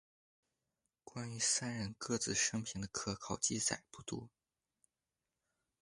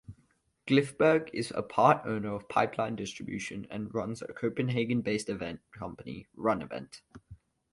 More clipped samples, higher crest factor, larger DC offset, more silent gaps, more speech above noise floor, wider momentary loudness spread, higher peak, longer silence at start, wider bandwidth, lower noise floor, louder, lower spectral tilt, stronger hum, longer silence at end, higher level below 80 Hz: neither; about the same, 22 dB vs 24 dB; neither; neither; first, over 50 dB vs 39 dB; second, 13 LU vs 17 LU; second, -20 dBFS vs -8 dBFS; first, 1.05 s vs 0.1 s; about the same, 11.5 kHz vs 11.5 kHz; first, under -90 dBFS vs -70 dBFS; second, -38 LUFS vs -31 LUFS; second, -2.5 dB/octave vs -6 dB/octave; neither; first, 1.55 s vs 0.35 s; second, -68 dBFS vs -62 dBFS